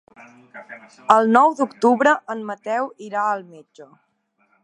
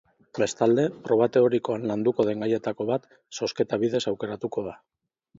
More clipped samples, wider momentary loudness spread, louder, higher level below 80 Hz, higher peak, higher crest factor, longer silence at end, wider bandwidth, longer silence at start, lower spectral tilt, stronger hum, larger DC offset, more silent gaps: neither; first, 19 LU vs 10 LU; first, -19 LUFS vs -25 LUFS; second, -74 dBFS vs -66 dBFS; first, 0 dBFS vs -8 dBFS; about the same, 20 dB vs 18 dB; first, 0.8 s vs 0.65 s; first, 10.5 kHz vs 7.8 kHz; first, 0.55 s vs 0.35 s; about the same, -5 dB/octave vs -6 dB/octave; neither; neither; neither